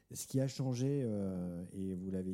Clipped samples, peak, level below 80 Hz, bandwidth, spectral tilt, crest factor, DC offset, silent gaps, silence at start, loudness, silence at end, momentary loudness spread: under 0.1%; -22 dBFS; -70 dBFS; 16 kHz; -7 dB/octave; 16 dB; under 0.1%; none; 0.1 s; -38 LUFS; 0 s; 7 LU